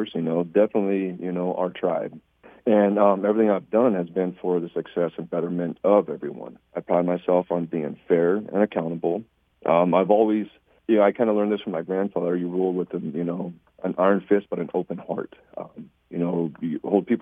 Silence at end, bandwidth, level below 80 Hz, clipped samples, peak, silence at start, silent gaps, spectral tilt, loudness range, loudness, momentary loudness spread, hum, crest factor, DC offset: 0 s; 3.8 kHz; -68 dBFS; under 0.1%; -4 dBFS; 0 s; none; -10 dB/octave; 4 LU; -24 LUFS; 13 LU; none; 20 dB; under 0.1%